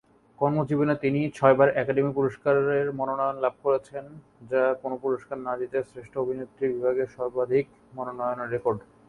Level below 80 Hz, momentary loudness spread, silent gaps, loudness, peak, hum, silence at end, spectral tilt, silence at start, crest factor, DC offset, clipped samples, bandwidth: -64 dBFS; 10 LU; none; -26 LUFS; -4 dBFS; none; 0.3 s; -8.5 dB/octave; 0.4 s; 22 dB; under 0.1%; under 0.1%; 10.5 kHz